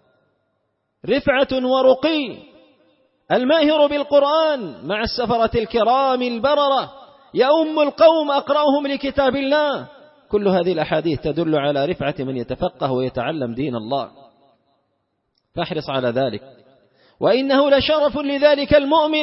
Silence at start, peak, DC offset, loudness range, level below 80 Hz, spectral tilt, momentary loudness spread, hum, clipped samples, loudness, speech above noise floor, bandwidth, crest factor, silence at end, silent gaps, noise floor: 1.05 s; -2 dBFS; under 0.1%; 8 LU; -46 dBFS; -9 dB/octave; 10 LU; none; under 0.1%; -18 LUFS; 53 dB; 5.8 kHz; 18 dB; 0 s; none; -71 dBFS